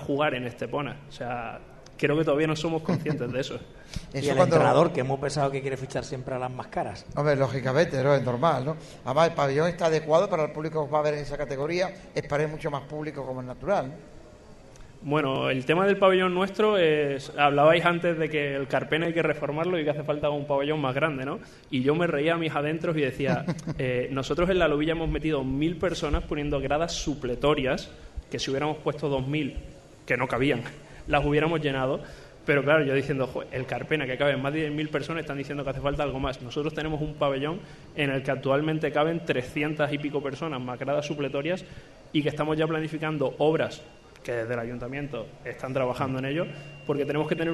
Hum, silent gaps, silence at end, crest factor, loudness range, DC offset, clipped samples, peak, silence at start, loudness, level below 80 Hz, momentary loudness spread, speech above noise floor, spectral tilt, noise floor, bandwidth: none; none; 0 s; 20 dB; 6 LU; under 0.1%; under 0.1%; -6 dBFS; 0 s; -27 LUFS; -46 dBFS; 11 LU; 22 dB; -6 dB/octave; -48 dBFS; 12 kHz